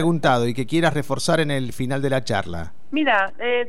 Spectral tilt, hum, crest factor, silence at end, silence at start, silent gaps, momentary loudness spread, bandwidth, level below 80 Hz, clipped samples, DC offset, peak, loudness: -5.5 dB/octave; none; 14 dB; 0 s; 0 s; none; 7 LU; 15.5 kHz; -48 dBFS; under 0.1%; 4%; -6 dBFS; -21 LUFS